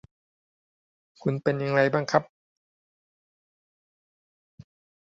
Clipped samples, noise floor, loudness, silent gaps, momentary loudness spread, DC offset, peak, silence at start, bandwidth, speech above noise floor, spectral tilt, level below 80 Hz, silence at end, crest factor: under 0.1%; under -90 dBFS; -25 LUFS; none; 7 LU; under 0.1%; -4 dBFS; 1.25 s; 7.8 kHz; over 66 dB; -6.5 dB/octave; -70 dBFS; 2.8 s; 26 dB